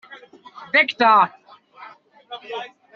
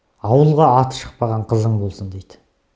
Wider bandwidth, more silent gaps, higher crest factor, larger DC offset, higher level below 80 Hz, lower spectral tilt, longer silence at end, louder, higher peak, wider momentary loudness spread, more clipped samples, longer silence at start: second, 7.2 kHz vs 8 kHz; neither; about the same, 18 dB vs 18 dB; neither; second, -76 dBFS vs -44 dBFS; second, 0 dB/octave vs -8 dB/octave; second, 0.3 s vs 0.55 s; about the same, -17 LUFS vs -17 LUFS; second, -4 dBFS vs 0 dBFS; about the same, 21 LU vs 19 LU; neither; second, 0.1 s vs 0.25 s